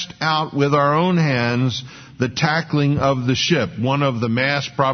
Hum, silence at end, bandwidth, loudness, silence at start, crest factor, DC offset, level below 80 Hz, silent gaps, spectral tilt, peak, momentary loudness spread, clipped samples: none; 0 s; 6.6 kHz; -19 LUFS; 0 s; 16 dB; under 0.1%; -50 dBFS; none; -5.5 dB/octave; -2 dBFS; 5 LU; under 0.1%